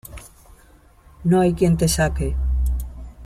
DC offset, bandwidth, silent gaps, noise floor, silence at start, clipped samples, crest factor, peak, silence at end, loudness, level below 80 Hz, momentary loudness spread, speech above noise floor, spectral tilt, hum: under 0.1%; 15.5 kHz; none; -51 dBFS; 0.05 s; under 0.1%; 16 dB; -6 dBFS; 0 s; -20 LUFS; -28 dBFS; 18 LU; 33 dB; -6 dB/octave; none